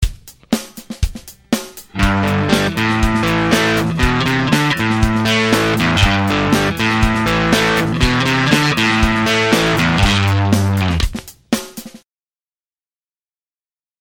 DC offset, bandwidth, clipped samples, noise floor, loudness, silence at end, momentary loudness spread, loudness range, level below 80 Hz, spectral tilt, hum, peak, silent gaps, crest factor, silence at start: under 0.1%; 18 kHz; under 0.1%; under -90 dBFS; -15 LUFS; 2.05 s; 9 LU; 5 LU; -26 dBFS; -5 dB/octave; none; 0 dBFS; none; 16 dB; 0 s